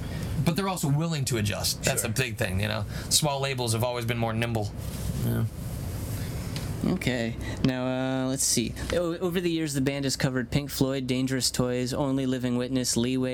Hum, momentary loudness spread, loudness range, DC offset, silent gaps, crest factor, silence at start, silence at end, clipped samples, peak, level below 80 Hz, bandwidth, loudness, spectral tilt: none; 8 LU; 4 LU; under 0.1%; none; 22 dB; 0 s; 0 s; under 0.1%; -6 dBFS; -44 dBFS; 18 kHz; -27 LUFS; -4.5 dB/octave